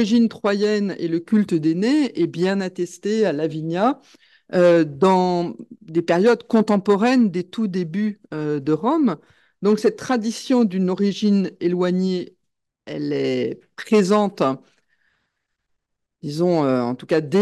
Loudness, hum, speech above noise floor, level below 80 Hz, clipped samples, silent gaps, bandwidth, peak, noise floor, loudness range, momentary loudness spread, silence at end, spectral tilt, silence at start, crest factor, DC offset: -20 LUFS; none; 58 dB; -68 dBFS; under 0.1%; none; 12 kHz; -4 dBFS; -77 dBFS; 4 LU; 10 LU; 0 s; -6.5 dB/octave; 0 s; 16 dB; under 0.1%